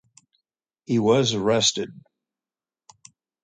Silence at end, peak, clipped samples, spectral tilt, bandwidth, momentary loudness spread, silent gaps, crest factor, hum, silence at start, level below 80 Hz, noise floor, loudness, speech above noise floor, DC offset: 1.45 s; -6 dBFS; under 0.1%; -4 dB/octave; 9.6 kHz; 12 LU; none; 18 dB; none; 0.9 s; -62 dBFS; under -90 dBFS; -21 LUFS; over 69 dB; under 0.1%